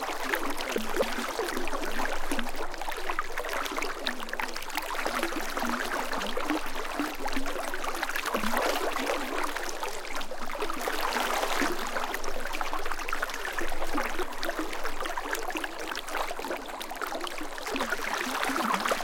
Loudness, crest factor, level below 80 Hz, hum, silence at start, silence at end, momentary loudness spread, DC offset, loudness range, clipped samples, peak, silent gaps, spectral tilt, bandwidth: -32 LUFS; 20 dB; -40 dBFS; none; 0 s; 0 s; 6 LU; under 0.1%; 2 LU; under 0.1%; -10 dBFS; none; -2.5 dB/octave; 17 kHz